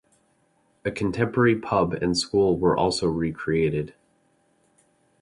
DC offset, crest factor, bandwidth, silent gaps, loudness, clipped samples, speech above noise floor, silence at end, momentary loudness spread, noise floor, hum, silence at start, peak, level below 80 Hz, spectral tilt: under 0.1%; 18 dB; 11.5 kHz; none; -24 LUFS; under 0.1%; 43 dB; 1.35 s; 9 LU; -66 dBFS; none; 0.85 s; -8 dBFS; -48 dBFS; -5.5 dB/octave